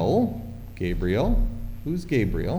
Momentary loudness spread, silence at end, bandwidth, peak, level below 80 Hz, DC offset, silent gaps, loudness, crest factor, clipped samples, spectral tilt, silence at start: 11 LU; 0 s; over 20 kHz; -10 dBFS; -30 dBFS; under 0.1%; none; -26 LUFS; 14 dB; under 0.1%; -8 dB/octave; 0 s